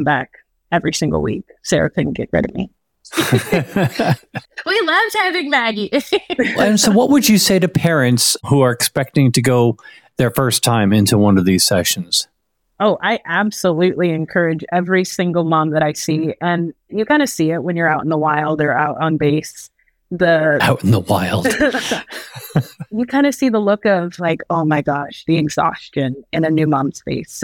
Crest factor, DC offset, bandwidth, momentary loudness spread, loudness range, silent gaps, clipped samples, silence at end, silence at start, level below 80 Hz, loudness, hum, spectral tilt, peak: 14 dB; under 0.1%; 18 kHz; 9 LU; 4 LU; none; under 0.1%; 0 s; 0 s; -48 dBFS; -16 LUFS; none; -4.5 dB/octave; -2 dBFS